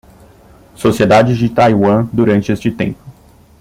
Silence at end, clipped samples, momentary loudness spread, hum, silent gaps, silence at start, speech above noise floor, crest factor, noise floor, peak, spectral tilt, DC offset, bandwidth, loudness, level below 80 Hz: 0.5 s; under 0.1%; 10 LU; none; none; 0.8 s; 32 dB; 14 dB; -43 dBFS; 0 dBFS; -7 dB/octave; under 0.1%; 16 kHz; -13 LUFS; -44 dBFS